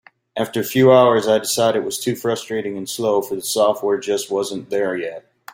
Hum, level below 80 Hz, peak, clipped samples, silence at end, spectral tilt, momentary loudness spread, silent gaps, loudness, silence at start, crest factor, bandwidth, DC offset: none; -62 dBFS; -2 dBFS; under 0.1%; 0.35 s; -4.5 dB/octave; 13 LU; none; -19 LUFS; 0.35 s; 18 dB; 16.5 kHz; under 0.1%